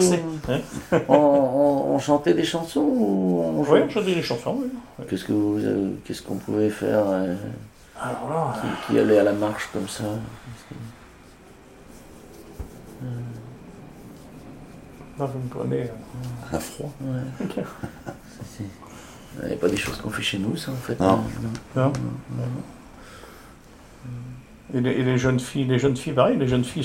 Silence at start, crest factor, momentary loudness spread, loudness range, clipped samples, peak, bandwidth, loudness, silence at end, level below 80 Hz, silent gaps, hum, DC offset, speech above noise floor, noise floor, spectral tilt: 0 s; 22 dB; 24 LU; 16 LU; under 0.1%; -2 dBFS; 16 kHz; -24 LUFS; 0 s; -50 dBFS; none; none; under 0.1%; 24 dB; -48 dBFS; -6 dB/octave